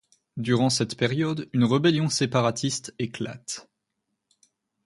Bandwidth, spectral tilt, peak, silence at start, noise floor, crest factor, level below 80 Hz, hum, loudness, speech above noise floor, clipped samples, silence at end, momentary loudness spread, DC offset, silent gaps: 11.5 kHz; -5 dB/octave; -8 dBFS; 0.35 s; -80 dBFS; 18 dB; -62 dBFS; none; -25 LUFS; 56 dB; under 0.1%; 1.25 s; 13 LU; under 0.1%; none